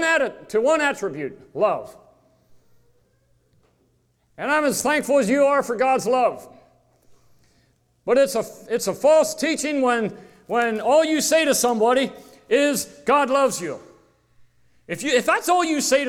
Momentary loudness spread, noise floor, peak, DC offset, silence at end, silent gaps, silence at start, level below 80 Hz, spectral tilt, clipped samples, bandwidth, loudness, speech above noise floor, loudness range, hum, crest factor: 11 LU; -64 dBFS; -6 dBFS; under 0.1%; 0 s; none; 0 s; -62 dBFS; -3 dB/octave; under 0.1%; 17 kHz; -20 LUFS; 44 dB; 7 LU; none; 16 dB